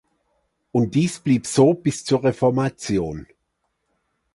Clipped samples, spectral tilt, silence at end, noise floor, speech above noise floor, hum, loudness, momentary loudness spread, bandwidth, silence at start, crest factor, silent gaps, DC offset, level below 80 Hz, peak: under 0.1%; -6 dB/octave; 1.1 s; -74 dBFS; 54 dB; none; -21 LUFS; 8 LU; 11.5 kHz; 0.75 s; 20 dB; none; under 0.1%; -52 dBFS; -2 dBFS